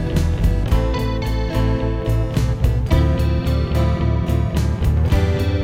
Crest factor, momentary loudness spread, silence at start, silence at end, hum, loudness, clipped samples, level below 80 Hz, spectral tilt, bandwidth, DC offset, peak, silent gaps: 14 dB; 4 LU; 0 s; 0 s; none; -19 LUFS; under 0.1%; -20 dBFS; -7.5 dB/octave; 16 kHz; under 0.1%; -4 dBFS; none